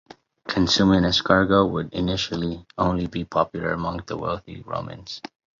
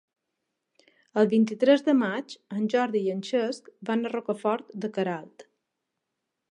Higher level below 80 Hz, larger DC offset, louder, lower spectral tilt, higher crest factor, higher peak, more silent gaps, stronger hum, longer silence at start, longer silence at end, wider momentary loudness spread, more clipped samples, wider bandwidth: first, -44 dBFS vs -82 dBFS; neither; first, -23 LUFS vs -26 LUFS; about the same, -5.5 dB/octave vs -6 dB/octave; about the same, 20 dB vs 18 dB; first, -2 dBFS vs -8 dBFS; neither; neither; second, 0.45 s vs 1.15 s; second, 0.4 s vs 1.1 s; first, 15 LU vs 12 LU; neither; second, 7.6 kHz vs 10 kHz